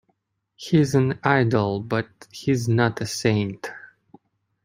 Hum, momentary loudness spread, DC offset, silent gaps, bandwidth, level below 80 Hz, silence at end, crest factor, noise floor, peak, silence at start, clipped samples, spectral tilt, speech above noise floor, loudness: none; 17 LU; under 0.1%; none; 16 kHz; -58 dBFS; 0.8 s; 20 dB; -71 dBFS; -2 dBFS; 0.6 s; under 0.1%; -6 dB/octave; 50 dB; -22 LUFS